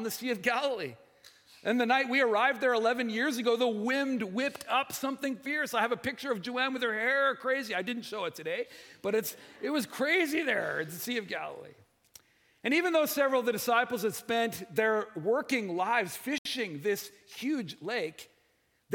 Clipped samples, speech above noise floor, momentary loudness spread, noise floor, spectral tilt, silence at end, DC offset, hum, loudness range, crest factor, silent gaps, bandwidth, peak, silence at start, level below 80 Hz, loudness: under 0.1%; 41 dB; 10 LU; -72 dBFS; -3.5 dB/octave; 0 s; under 0.1%; none; 4 LU; 20 dB; 16.38-16.45 s; 18 kHz; -12 dBFS; 0 s; -80 dBFS; -30 LUFS